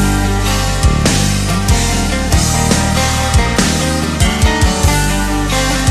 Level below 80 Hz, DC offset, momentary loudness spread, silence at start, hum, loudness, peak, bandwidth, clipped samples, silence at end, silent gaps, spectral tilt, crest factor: -18 dBFS; under 0.1%; 3 LU; 0 s; none; -13 LUFS; 0 dBFS; 13.5 kHz; under 0.1%; 0 s; none; -4 dB/octave; 12 dB